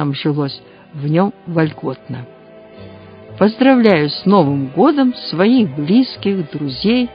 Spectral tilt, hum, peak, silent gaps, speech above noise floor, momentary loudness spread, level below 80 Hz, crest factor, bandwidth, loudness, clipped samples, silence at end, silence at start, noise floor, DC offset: -10 dB/octave; none; 0 dBFS; none; 23 dB; 14 LU; -52 dBFS; 16 dB; 5.2 kHz; -15 LUFS; under 0.1%; 0 s; 0 s; -38 dBFS; under 0.1%